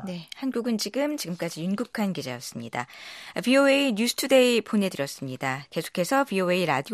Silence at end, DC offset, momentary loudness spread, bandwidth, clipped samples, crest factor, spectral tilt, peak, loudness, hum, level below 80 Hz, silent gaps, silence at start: 0 s; under 0.1%; 14 LU; 14.5 kHz; under 0.1%; 18 dB; -4.5 dB/octave; -8 dBFS; -25 LUFS; none; -72 dBFS; none; 0 s